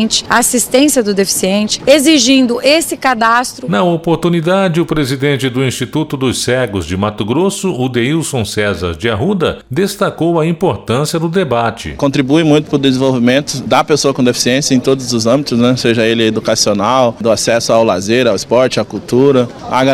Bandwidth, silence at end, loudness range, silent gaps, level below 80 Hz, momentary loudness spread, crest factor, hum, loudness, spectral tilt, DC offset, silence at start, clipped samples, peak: 16.5 kHz; 0 s; 4 LU; none; -42 dBFS; 6 LU; 12 dB; none; -12 LUFS; -4.5 dB/octave; under 0.1%; 0 s; 0.2%; 0 dBFS